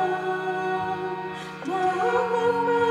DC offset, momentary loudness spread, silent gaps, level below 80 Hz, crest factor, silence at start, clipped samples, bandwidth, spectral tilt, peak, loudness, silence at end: under 0.1%; 9 LU; none; -66 dBFS; 14 dB; 0 s; under 0.1%; 12 kHz; -5.5 dB/octave; -10 dBFS; -26 LUFS; 0 s